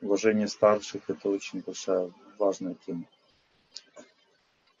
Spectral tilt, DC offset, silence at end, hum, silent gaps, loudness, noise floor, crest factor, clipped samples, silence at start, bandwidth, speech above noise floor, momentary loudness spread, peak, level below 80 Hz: -5 dB/octave; under 0.1%; 0.8 s; none; none; -29 LUFS; -68 dBFS; 22 dB; under 0.1%; 0 s; 7.8 kHz; 40 dB; 22 LU; -8 dBFS; -78 dBFS